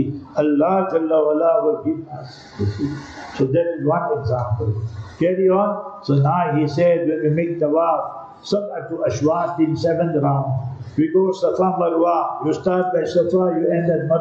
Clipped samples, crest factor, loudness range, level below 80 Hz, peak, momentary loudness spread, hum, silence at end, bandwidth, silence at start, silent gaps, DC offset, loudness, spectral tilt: under 0.1%; 12 dB; 3 LU; -54 dBFS; -8 dBFS; 9 LU; none; 0 s; 7.6 kHz; 0 s; none; under 0.1%; -19 LUFS; -8 dB/octave